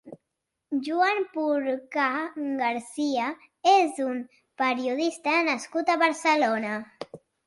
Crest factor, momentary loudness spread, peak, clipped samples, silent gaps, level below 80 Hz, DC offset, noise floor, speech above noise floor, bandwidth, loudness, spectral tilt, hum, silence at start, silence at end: 18 dB; 11 LU; -8 dBFS; under 0.1%; none; -78 dBFS; under 0.1%; -83 dBFS; 57 dB; 11.5 kHz; -26 LUFS; -3 dB/octave; none; 0.05 s; 0.3 s